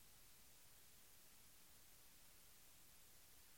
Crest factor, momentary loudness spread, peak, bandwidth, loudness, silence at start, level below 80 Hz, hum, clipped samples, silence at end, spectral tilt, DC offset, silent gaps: 16 dB; 0 LU; -52 dBFS; 16.5 kHz; -66 LUFS; 0 s; -80 dBFS; none; under 0.1%; 0 s; -1 dB/octave; under 0.1%; none